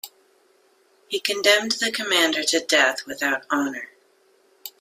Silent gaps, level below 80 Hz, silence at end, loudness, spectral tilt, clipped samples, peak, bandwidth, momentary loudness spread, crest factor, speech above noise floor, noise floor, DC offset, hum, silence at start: none; -72 dBFS; 0.1 s; -21 LUFS; -0.5 dB/octave; under 0.1%; 0 dBFS; 16 kHz; 21 LU; 24 dB; 38 dB; -60 dBFS; under 0.1%; none; 0.05 s